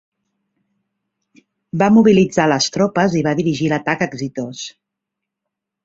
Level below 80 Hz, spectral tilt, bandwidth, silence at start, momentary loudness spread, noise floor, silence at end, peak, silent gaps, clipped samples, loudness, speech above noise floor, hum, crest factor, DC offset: -54 dBFS; -5.5 dB/octave; 7.8 kHz; 1.75 s; 16 LU; -81 dBFS; 1.15 s; -2 dBFS; none; under 0.1%; -16 LUFS; 66 dB; none; 16 dB; under 0.1%